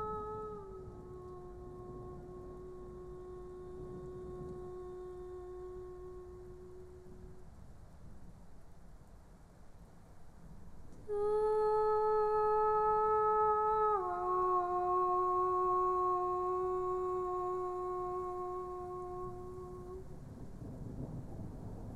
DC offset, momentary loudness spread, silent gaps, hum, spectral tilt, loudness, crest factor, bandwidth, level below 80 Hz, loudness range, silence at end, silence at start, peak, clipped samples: under 0.1%; 21 LU; none; none; -8.5 dB/octave; -35 LUFS; 14 dB; 11 kHz; -56 dBFS; 19 LU; 0 s; 0 s; -22 dBFS; under 0.1%